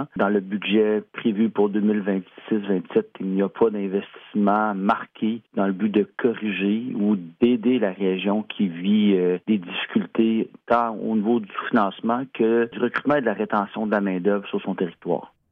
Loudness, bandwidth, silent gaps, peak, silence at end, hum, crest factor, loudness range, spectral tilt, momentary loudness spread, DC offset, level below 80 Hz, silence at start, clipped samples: -23 LUFS; 4 kHz; none; -6 dBFS; 0.25 s; none; 16 dB; 2 LU; -9.5 dB/octave; 6 LU; under 0.1%; -68 dBFS; 0 s; under 0.1%